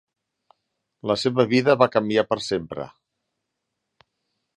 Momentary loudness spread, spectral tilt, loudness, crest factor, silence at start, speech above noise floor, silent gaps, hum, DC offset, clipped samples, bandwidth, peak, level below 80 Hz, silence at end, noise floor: 16 LU; -5.5 dB/octave; -21 LUFS; 24 dB; 1.05 s; 59 dB; none; none; under 0.1%; under 0.1%; 11 kHz; -2 dBFS; -62 dBFS; 1.7 s; -80 dBFS